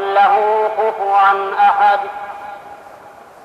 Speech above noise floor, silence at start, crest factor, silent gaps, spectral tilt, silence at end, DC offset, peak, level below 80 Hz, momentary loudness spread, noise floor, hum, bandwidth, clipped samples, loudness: 26 dB; 0 s; 12 dB; none; -3.5 dB/octave; 0.35 s; under 0.1%; -2 dBFS; -66 dBFS; 18 LU; -39 dBFS; none; 7.2 kHz; under 0.1%; -14 LUFS